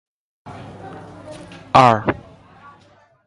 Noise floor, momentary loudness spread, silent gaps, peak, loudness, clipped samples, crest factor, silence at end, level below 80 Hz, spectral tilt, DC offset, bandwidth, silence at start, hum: -53 dBFS; 25 LU; none; 0 dBFS; -15 LUFS; under 0.1%; 22 dB; 1.15 s; -50 dBFS; -6 dB/octave; under 0.1%; 11.5 kHz; 0.45 s; none